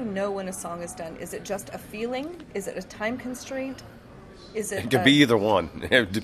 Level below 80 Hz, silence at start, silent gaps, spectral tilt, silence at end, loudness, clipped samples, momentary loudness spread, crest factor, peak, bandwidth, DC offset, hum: -54 dBFS; 0 s; none; -4.5 dB/octave; 0 s; -26 LUFS; under 0.1%; 17 LU; 24 dB; -2 dBFS; 14 kHz; under 0.1%; none